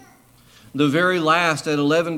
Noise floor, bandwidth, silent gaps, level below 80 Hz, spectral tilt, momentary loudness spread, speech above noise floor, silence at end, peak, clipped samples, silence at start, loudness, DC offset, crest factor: -51 dBFS; 15.5 kHz; none; -64 dBFS; -5 dB/octave; 5 LU; 33 dB; 0 s; -4 dBFS; under 0.1%; 0.75 s; -19 LUFS; under 0.1%; 16 dB